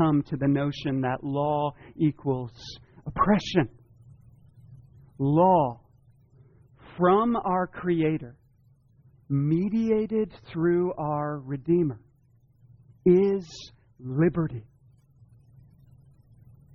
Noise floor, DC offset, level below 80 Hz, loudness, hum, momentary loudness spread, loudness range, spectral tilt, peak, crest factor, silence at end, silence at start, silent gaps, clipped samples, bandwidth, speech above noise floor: -61 dBFS; under 0.1%; -54 dBFS; -26 LUFS; none; 19 LU; 3 LU; -8.5 dB/octave; -8 dBFS; 20 dB; 2.15 s; 0 s; none; under 0.1%; 7.2 kHz; 36 dB